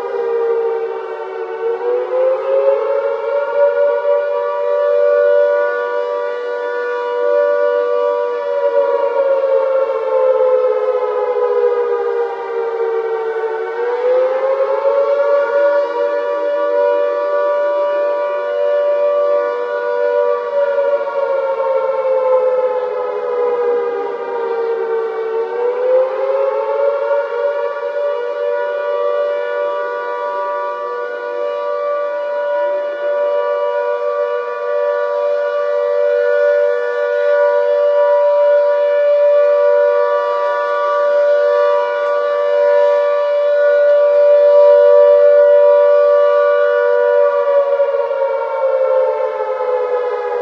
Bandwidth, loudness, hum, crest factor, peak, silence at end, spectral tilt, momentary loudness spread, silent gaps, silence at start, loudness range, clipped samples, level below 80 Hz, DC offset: 5.8 kHz; -15 LUFS; none; 14 dB; 0 dBFS; 0 s; -3.5 dB/octave; 8 LU; none; 0 s; 7 LU; under 0.1%; -88 dBFS; under 0.1%